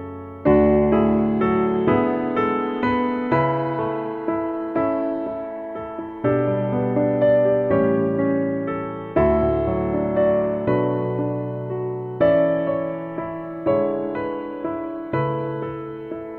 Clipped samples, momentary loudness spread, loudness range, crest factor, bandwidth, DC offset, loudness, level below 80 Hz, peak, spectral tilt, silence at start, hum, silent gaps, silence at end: under 0.1%; 11 LU; 4 LU; 16 dB; 4.3 kHz; under 0.1%; -21 LUFS; -42 dBFS; -6 dBFS; -10.5 dB/octave; 0 s; none; none; 0 s